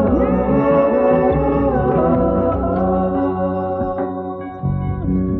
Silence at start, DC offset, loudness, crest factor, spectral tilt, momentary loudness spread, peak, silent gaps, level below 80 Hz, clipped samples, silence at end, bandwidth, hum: 0 s; under 0.1%; -17 LUFS; 12 dB; -9.5 dB/octave; 8 LU; -4 dBFS; none; -30 dBFS; under 0.1%; 0 s; 4.1 kHz; none